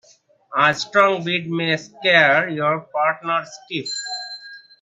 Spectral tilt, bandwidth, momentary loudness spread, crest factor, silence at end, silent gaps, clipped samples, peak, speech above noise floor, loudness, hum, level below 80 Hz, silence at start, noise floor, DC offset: -4 dB/octave; 9.4 kHz; 14 LU; 20 dB; 0.25 s; none; under 0.1%; 0 dBFS; 36 dB; -19 LUFS; none; -70 dBFS; 0.5 s; -55 dBFS; under 0.1%